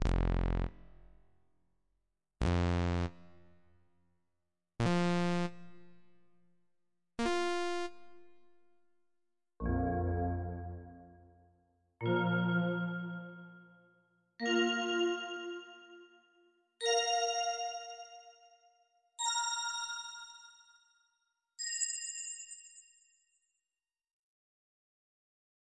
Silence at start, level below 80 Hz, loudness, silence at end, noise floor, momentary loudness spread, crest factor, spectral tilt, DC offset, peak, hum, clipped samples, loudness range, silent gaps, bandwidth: 0 s; -48 dBFS; -35 LUFS; 2.95 s; under -90 dBFS; 19 LU; 18 dB; -4.5 dB/octave; under 0.1%; -20 dBFS; none; under 0.1%; 6 LU; none; 11.5 kHz